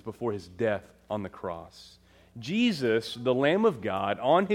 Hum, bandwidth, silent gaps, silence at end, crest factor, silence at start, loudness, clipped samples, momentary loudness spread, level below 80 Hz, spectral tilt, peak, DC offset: none; 15 kHz; none; 0 s; 18 dB; 0.05 s; -28 LUFS; under 0.1%; 14 LU; -64 dBFS; -6 dB/octave; -10 dBFS; under 0.1%